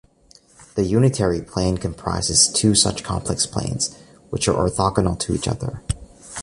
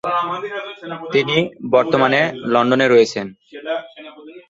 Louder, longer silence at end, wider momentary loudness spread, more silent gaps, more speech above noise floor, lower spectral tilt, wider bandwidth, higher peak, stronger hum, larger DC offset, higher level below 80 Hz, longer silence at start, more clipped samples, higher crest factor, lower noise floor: second, -20 LUFS vs -17 LUFS; about the same, 0 s vs 0.1 s; second, 14 LU vs 19 LU; neither; first, 33 dB vs 21 dB; second, -4 dB/octave vs -5.5 dB/octave; first, 11.5 kHz vs 7.8 kHz; about the same, -2 dBFS vs 0 dBFS; neither; neither; first, -38 dBFS vs -60 dBFS; first, 0.6 s vs 0.05 s; neither; about the same, 20 dB vs 18 dB; first, -53 dBFS vs -38 dBFS